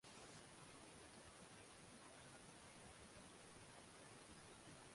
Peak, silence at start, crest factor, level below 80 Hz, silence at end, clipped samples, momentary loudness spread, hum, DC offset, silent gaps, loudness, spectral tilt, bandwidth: -48 dBFS; 0.05 s; 16 dB; -78 dBFS; 0 s; under 0.1%; 1 LU; none; under 0.1%; none; -61 LUFS; -3 dB/octave; 11.5 kHz